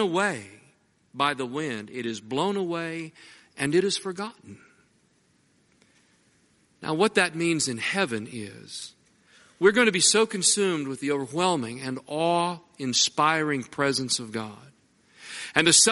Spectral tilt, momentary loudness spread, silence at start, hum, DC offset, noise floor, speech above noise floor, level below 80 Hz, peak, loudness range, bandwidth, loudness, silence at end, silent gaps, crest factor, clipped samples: -2.5 dB/octave; 18 LU; 0 s; none; under 0.1%; -65 dBFS; 40 dB; -70 dBFS; -2 dBFS; 8 LU; 11.5 kHz; -24 LUFS; 0 s; none; 24 dB; under 0.1%